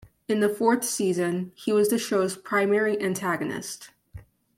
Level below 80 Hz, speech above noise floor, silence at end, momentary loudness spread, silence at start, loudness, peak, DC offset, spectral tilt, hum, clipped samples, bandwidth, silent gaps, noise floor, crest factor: -62 dBFS; 22 dB; 0.35 s; 9 LU; 0.3 s; -25 LUFS; -8 dBFS; under 0.1%; -4.5 dB/octave; none; under 0.1%; 16.5 kHz; none; -47 dBFS; 18 dB